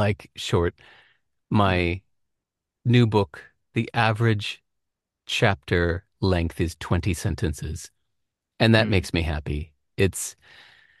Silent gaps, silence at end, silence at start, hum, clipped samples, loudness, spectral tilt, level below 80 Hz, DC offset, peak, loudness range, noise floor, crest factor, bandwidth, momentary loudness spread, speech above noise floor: none; 0.7 s; 0 s; none; under 0.1%; -24 LUFS; -5.5 dB/octave; -38 dBFS; under 0.1%; -2 dBFS; 2 LU; -83 dBFS; 22 dB; 12.5 kHz; 13 LU; 60 dB